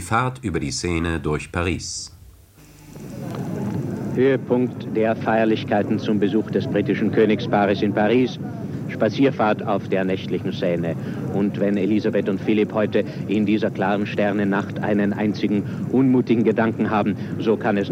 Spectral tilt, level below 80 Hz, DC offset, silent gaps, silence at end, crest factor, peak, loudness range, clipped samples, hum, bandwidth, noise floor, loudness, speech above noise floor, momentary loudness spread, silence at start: -6.5 dB/octave; -48 dBFS; under 0.1%; none; 0 s; 16 dB; -4 dBFS; 5 LU; under 0.1%; none; 15 kHz; -47 dBFS; -21 LUFS; 27 dB; 8 LU; 0 s